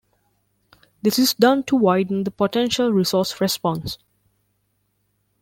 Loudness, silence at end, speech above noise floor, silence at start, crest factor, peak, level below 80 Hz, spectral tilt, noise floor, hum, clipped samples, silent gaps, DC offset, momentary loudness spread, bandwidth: -20 LUFS; 1.45 s; 50 dB; 1.05 s; 20 dB; -2 dBFS; -56 dBFS; -4.5 dB/octave; -69 dBFS; 50 Hz at -45 dBFS; under 0.1%; none; under 0.1%; 8 LU; 17 kHz